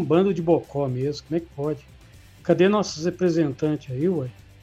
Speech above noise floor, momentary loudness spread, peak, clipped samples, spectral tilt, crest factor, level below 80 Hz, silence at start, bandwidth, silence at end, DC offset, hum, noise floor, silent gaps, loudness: 25 dB; 10 LU; -6 dBFS; under 0.1%; -7 dB/octave; 18 dB; -54 dBFS; 0 s; 8.6 kHz; 0.3 s; under 0.1%; none; -48 dBFS; none; -24 LUFS